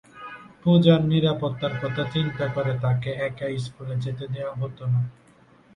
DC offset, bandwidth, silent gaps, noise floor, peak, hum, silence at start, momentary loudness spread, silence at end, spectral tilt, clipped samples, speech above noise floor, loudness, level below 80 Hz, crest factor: under 0.1%; 9.8 kHz; none; -55 dBFS; -4 dBFS; none; 0.15 s; 13 LU; 0.65 s; -8 dB/octave; under 0.1%; 31 dB; -24 LUFS; -56 dBFS; 20 dB